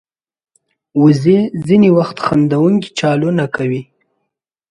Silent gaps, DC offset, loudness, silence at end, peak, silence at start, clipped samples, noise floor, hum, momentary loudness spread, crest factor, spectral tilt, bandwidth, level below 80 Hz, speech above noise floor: none; under 0.1%; -13 LUFS; 0.85 s; 0 dBFS; 0.95 s; under 0.1%; -75 dBFS; none; 9 LU; 14 dB; -7.5 dB/octave; 11 kHz; -52 dBFS; 62 dB